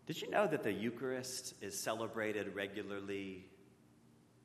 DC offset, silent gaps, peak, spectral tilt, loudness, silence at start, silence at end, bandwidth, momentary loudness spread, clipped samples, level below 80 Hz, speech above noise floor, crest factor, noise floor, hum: under 0.1%; none; -20 dBFS; -4 dB/octave; -40 LUFS; 0 s; 0.7 s; 13.5 kHz; 9 LU; under 0.1%; -82 dBFS; 26 dB; 22 dB; -66 dBFS; none